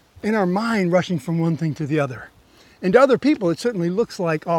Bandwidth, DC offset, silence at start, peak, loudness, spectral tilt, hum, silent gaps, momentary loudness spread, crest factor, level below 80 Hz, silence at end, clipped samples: 13.5 kHz; under 0.1%; 0.25 s; -2 dBFS; -20 LUFS; -7 dB/octave; none; none; 8 LU; 20 dB; -58 dBFS; 0 s; under 0.1%